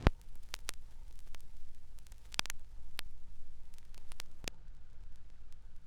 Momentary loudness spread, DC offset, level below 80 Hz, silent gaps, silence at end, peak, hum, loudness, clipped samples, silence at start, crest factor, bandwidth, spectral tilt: 20 LU; under 0.1%; -46 dBFS; none; 0 s; -6 dBFS; none; -44 LUFS; under 0.1%; 0 s; 32 dB; 16.5 kHz; -4 dB/octave